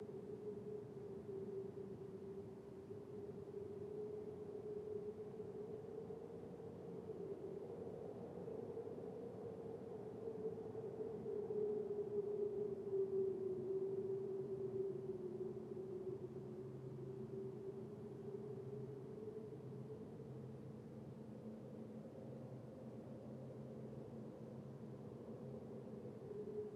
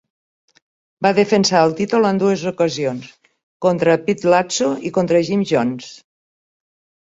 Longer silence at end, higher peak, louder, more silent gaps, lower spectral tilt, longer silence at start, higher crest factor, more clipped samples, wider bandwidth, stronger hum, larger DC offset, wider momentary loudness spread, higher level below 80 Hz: second, 0 s vs 1.1 s; second, -32 dBFS vs -2 dBFS; second, -49 LUFS vs -17 LUFS; second, none vs 3.43-3.60 s; first, -9.5 dB/octave vs -5 dB/octave; second, 0 s vs 1 s; about the same, 16 dB vs 16 dB; neither; first, 11 kHz vs 8 kHz; neither; neither; about the same, 10 LU vs 9 LU; second, -78 dBFS vs -60 dBFS